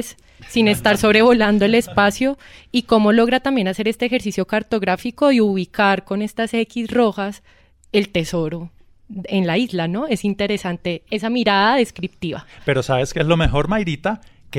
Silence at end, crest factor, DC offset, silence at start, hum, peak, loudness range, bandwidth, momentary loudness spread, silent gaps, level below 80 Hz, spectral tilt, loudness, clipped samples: 0 s; 16 dB; under 0.1%; 0 s; none; -4 dBFS; 6 LU; 16 kHz; 12 LU; none; -38 dBFS; -5.5 dB/octave; -18 LUFS; under 0.1%